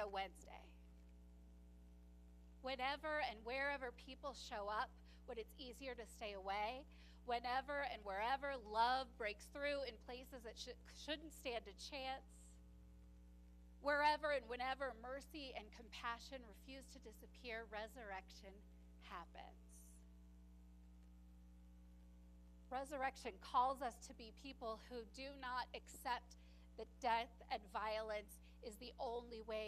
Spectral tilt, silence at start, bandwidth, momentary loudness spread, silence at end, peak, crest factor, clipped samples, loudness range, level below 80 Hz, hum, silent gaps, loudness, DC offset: -3.5 dB/octave; 0 s; 14 kHz; 23 LU; 0 s; -24 dBFS; 24 dB; under 0.1%; 11 LU; -64 dBFS; 60 Hz at -65 dBFS; none; -47 LUFS; under 0.1%